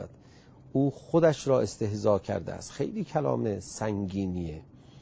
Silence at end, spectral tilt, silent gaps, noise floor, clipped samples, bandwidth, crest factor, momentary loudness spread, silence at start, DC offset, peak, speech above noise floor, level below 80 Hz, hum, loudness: 0 s; -6.5 dB/octave; none; -54 dBFS; under 0.1%; 8 kHz; 20 dB; 11 LU; 0 s; under 0.1%; -10 dBFS; 26 dB; -52 dBFS; none; -29 LUFS